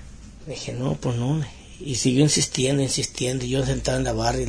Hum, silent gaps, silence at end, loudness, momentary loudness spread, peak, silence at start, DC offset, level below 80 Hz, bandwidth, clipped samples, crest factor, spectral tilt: none; none; 0 s; -23 LUFS; 15 LU; -4 dBFS; 0 s; under 0.1%; -40 dBFS; 11 kHz; under 0.1%; 18 dB; -4.5 dB/octave